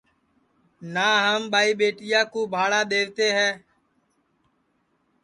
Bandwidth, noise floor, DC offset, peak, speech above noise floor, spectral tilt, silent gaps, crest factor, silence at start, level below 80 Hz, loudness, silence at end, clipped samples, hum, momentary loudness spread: 11.5 kHz; -69 dBFS; under 0.1%; -6 dBFS; 47 dB; -2.5 dB/octave; none; 20 dB; 0.8 s; -74 dBFS; -22 LUFS; 1.65 s; under 0.1%; none; 6 LU